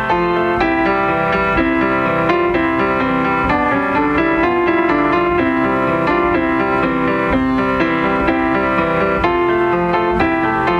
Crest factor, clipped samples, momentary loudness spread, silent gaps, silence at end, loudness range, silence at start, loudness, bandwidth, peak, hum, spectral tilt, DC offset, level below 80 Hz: 12 dB; under 0.1%; 1 LU; none; 0 s; 1 LU; 0 s; -15 LUFS; 7 kHz; -2 dBFS; none; -7.5 dB/octave; under 0.1%; -34 dBFS